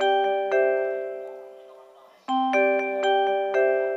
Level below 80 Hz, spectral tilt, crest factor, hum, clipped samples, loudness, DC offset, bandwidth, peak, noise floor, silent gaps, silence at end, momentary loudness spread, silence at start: under -90 dBFS; -3 dB/octave; 14 dB; none; under 0.1%; -23 LUFS; under 0.1%; 7.6 kHz; -10 dBFS; -51 dBFS; none; 0 s; 15 LU; 0 s